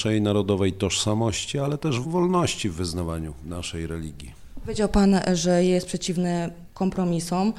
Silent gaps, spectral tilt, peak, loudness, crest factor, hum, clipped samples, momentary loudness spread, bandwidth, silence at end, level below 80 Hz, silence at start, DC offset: none; -5.5 dB/octave; -8 dBFS; -24 LUFS; 16 dB; none; under 0.1%; 13 LU; 13.5 kHz; 0 s; -40 dBFS; 0 s; under 0.1%